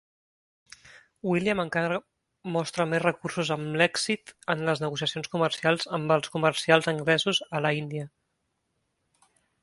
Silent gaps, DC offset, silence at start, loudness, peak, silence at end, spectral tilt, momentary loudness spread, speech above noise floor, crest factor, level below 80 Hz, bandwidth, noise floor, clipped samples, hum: none; under 0.1%; 0.85 s; -27 LUFS; -4 dBFS; 1.55 s; -4.5 dB/octave; 9 LU; 51 dB; 24 dB; -66 dBFS; 11.5 kHz; -77 dBFS; under 0.1%; none